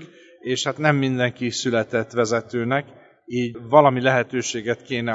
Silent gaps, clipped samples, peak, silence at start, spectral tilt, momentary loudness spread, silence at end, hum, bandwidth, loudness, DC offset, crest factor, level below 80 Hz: none; under 0.1%; 0 dBFS; 0 s; -5 dB/octave; 10 LU; 0 s; none; 8 kHz; -21 LUFS; under 0.1%; 22 dB; -64 dBFS